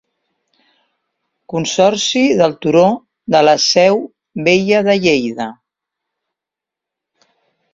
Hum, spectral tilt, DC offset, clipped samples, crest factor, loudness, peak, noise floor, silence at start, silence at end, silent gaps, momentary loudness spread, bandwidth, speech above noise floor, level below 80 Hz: none; -4 dB/octave; under 0.1%; under 0.1%; 16 dB; -13 LUFS; 0 dBFS; -85 dBFS; 1.5 s; 2.2 s; none; 13 LU; 7.8 kHz; 72 dB; -56 dBFS